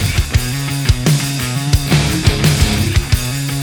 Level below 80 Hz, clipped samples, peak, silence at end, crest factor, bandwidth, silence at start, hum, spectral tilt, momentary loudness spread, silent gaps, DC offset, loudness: -22 dBFS; under 0.1%; 0 dBFS; 0 s; 14 dB; over 20 kHz; 0 s; none; -4.5 dB/octave; 5 LU; none; under 0.1%; -15 LUFS